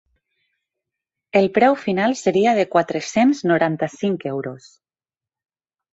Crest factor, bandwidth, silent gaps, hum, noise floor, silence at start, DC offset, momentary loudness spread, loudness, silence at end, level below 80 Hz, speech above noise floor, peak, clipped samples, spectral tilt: 18 dB; 8 kHz; none; none; under -90 dBFS; 1.35 s; under 0.1%; 8 LU; -19 LUFS; 1.35 s; -64 dBFS; over 72 dB; -2 dBFS; under 0.1%; -5.5 dB/octave